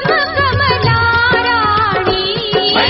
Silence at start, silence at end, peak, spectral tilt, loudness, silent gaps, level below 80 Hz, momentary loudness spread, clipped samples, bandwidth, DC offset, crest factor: 0 s; 0 s; 0 dBFS; -2 dB/octave; -12 LUFS; none; -34 dBFS; 3 LU; under 0.1%; 6 kHz; under 0.1%; 12 dB